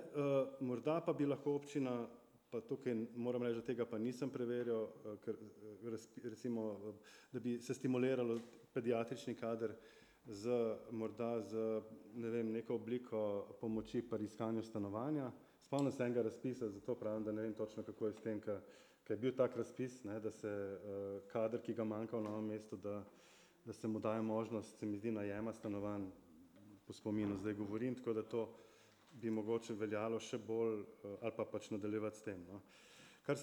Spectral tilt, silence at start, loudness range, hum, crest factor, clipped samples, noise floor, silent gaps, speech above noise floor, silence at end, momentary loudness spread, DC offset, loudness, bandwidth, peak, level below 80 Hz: -7 dB/octave; 0 s; 3 LU; none; 20 dB; under 0.1%; -67 dBFS; none; 24 dB; 0 s; 12 LU; under 0.1%; -43 LUFS; over 20 kHz; -24 dBFS; -80 dBFS